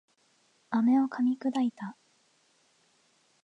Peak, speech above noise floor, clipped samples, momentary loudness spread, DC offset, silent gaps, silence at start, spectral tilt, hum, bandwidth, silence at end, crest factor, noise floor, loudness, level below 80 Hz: -16 dBFS; 41 dB; under 0.1%; 14 LU; under 0.1%; none; 0.7 s; -6.5 dB/octave; none; 8 kHz; 1.5 s; 16 dB; -69 dBFS; -28 LUFS; -86 dBFS